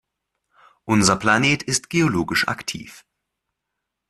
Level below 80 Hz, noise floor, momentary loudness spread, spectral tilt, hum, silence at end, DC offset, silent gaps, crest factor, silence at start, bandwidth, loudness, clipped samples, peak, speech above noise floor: -52 dBFS; -81 dBFS; 13 LU; -3.5 dB/octave; none; 1.15 s; under 0.1%; none; 20 dB; 0.85 s; 13.5 kHz; -19 LUFS; under 0.1%; -2 dBFS; 61 dB